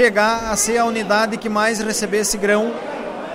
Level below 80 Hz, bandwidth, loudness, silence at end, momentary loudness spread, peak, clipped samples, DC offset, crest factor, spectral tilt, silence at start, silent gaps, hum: -46 dBFS; 16 kHz; -18 LUFS; 0 s; 7 LU; -2 dBFS; under 0.1%; under 0.1%; 16 dB; -2.5 dB/octave; 0 s; none; none